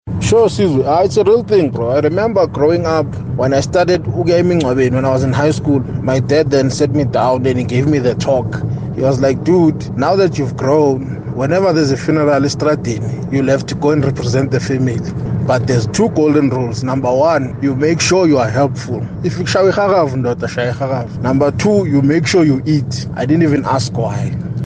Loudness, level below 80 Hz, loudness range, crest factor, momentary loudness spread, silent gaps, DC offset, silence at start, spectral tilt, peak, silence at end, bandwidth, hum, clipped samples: -14 LUFS; -40 dBFS; 2 LU; 10 dB; 7 LU; none; under 0.1%; 0.05 s; -6.5 dB/octave; -2 dBFS; 0 s; 9.6 kHz; none; under 0.1%